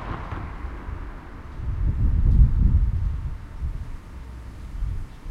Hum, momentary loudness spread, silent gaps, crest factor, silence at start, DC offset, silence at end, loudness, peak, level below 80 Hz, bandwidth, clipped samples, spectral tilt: none; 20 LU; none; 18 dB; 0 s; under 0.1%; 0 s; -26 LUFS; -6 dBFS; -24 dBFS; 4.7 kHz; under 0.1%; -9 dB/octave